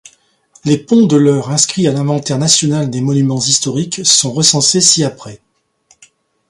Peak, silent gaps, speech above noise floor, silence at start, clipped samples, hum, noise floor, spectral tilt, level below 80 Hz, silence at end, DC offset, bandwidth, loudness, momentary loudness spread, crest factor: 0 dBFS; none; 42 dB; 0.65 s; under 0.1%; none; -54 dBFS; -4 dB/octave; -54 dBFS; 1.15 s; under 0.1%; 16 kHz; -11 LUFS; 7 LU; 14 dB